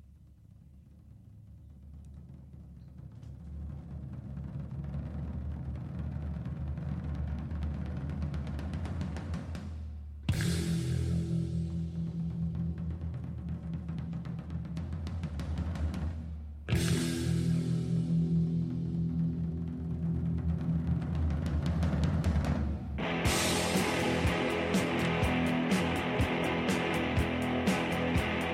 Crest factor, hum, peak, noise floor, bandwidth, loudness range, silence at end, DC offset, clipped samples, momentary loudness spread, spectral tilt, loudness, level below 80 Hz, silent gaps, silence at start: 16 dB; none; -18 dBFS; -56 dBFS; 16 kHz; 12 LU; 0 s; under 0.1%; under 0.1%; 14 LU; -6 dB/octave; -33 LUFS; -42 dBFS; none; 0.05 s